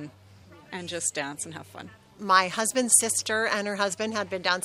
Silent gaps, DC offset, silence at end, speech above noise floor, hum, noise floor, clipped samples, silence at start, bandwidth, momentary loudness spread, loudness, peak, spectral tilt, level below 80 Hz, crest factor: none; under 0.1%; 0 s; 25 dB; none; -52 dBFS; under 0.1%; 0 s; 15.5 kHz; 21 LU; -25 LUFS; -2 dBFS; -1.5 dB/octave; -70 dBFS; 24 dB